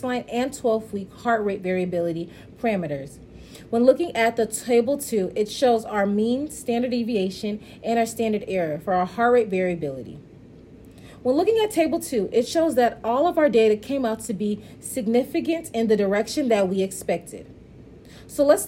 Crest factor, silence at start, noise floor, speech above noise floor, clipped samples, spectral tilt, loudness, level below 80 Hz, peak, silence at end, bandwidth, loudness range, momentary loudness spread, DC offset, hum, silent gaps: 18 dB; 0 s; -46 dBFS; 23 dB; under 0.1%; -5 dB/octave; -23 LUFS; -54 dBFS; -4 dBFS; 0 s; 16 kHz; 3 LU; 11 LU; under 0.1%; none; none